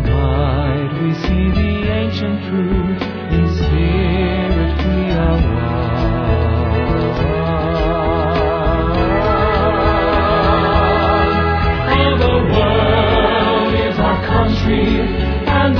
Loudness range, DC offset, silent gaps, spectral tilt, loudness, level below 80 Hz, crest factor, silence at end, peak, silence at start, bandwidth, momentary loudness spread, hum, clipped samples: 3 LU; under 0.1%; none; -8.5 dB/octave; -15 LUFS; -22 dBFS; 14 dB; 0 s; 0 dBFS; 0 s; 5.4 kHz; 5 LU; none; under 0.1%